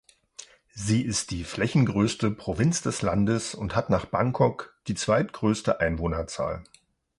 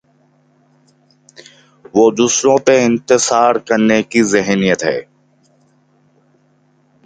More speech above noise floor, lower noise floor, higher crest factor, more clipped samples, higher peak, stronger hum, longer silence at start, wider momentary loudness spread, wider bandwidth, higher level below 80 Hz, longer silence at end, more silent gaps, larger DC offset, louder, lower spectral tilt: second, 24 dB vs 43 dB; second, -49 dBFS vs -56 dBFS; about the same, 20 dB vs 16 dB; neither; second, -6 dBFS vs 0 dBFS; neither; second, 0.4 s vs 1.95 s; first, 12 LU vs 5 LU; first, 11.5 kHz vs 9.6 kHz; first, -46 dBFS vs -56 dBFS; second, 0.55 s vs 2.05 s; neither; neither; second, -26 LUFS vs -13 LUFS; first, -5.5 dB/octave vs -4 dB/octave